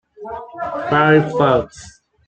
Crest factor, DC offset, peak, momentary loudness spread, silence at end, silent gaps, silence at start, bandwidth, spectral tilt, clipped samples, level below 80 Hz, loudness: 16 dB; under 0.1%; -2 dBFS; 19 LU; 0.4 s; none; 0.2 s; 9 kHz; -6.5 dB/octave; under 0.1%; -48 dBFS; -16 LUFS